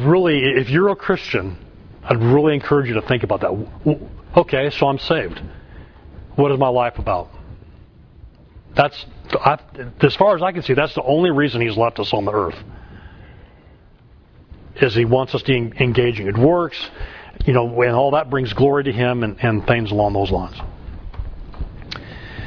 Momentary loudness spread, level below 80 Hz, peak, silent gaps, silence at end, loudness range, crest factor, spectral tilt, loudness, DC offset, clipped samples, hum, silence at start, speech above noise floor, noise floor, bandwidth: 18 LU; -38 dBFS; 0 dBFS; none; 0 s; 5 LU; 18 dB; -8.5 dB/octave; -18 LUFS; under 0.1%; under 0.1%; none; 0 s; 30 dB; -47 dBFS; 5.4 kHz